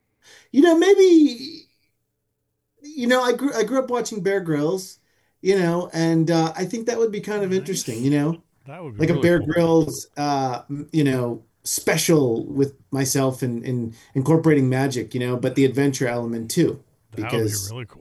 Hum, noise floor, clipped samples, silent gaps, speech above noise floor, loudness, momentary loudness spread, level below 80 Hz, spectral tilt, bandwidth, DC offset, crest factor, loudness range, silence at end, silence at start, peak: none; -75 dBFS; under 0.1%; none; 55 dB; -21 LUFS; 11 LU; -58 dBFS; -5.5 dB/octave; 13 kHz; under 0.1%; 16 dB; 3 LU; 0.15 s; 0.55 s; -4 dBFS